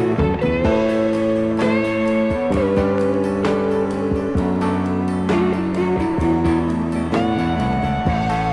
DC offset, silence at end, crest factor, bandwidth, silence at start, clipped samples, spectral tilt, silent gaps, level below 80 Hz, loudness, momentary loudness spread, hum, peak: under 0.1%; 0 s; 14 dB; 12 kHz; 0 s; under 0.1%; -7.5 dB/octave; none; -36 dBFS; -19 LUFS; 3 LU; none; -4 dBFS